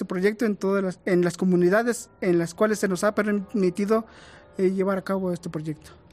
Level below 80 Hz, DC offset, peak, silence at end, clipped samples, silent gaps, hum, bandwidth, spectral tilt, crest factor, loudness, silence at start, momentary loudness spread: -62 dBFS; under 0.1%; -10 dBFS; 0.2 s; under 0.1%; none; none; 15 kHz; -6.5 dB/octave; 14 dB; -24 LUFS; 0 s; 10 LU